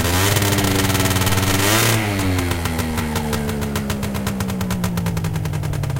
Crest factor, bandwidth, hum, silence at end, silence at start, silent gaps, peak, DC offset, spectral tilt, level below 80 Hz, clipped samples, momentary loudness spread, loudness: 16 dB; 17 kHz; none; 0 s; 0 s; none; -4 dBFS; under 0.1%; -4 dB/octave; -34 dBFS; under 0.1%; 8 LU; -19 LUFS